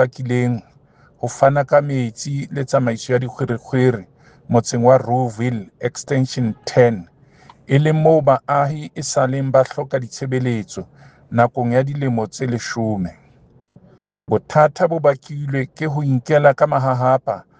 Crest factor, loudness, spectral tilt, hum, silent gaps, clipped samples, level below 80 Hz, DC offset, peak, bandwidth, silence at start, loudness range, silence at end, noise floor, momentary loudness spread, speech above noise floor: 18 dB; -18 LUFS; -6.5 dB/octave; none; none; under 0.1%; -56 dBFS; under 0.1%; 0 dBFS; 9.6 kHz; 0 s; 4 LU; 0.2 s; -52 dBFS; 11 LU; 34 dB